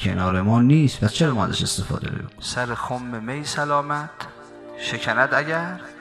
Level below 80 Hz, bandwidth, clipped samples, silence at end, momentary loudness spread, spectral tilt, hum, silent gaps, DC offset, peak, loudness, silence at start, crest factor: -48 dBFS; 14.5 kHz; under 0.1%; 0 s; 13 LU; -5 dB/octave; none; none; under 0.1%; -4 dBFS; -22 LUFS; 0 s; 18 dB